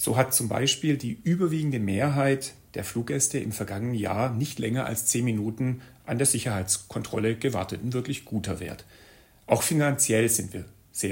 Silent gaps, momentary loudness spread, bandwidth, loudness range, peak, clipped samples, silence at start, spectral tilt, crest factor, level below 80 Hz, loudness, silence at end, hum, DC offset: none; 11 LU; 16.5 kHz; 2 LU; -8 dBFS; under 0.1%; 0 s; -4 dB/octave; 20 dB; -58 dBFS; -26 LUFS; 0 s; none; under 0.1%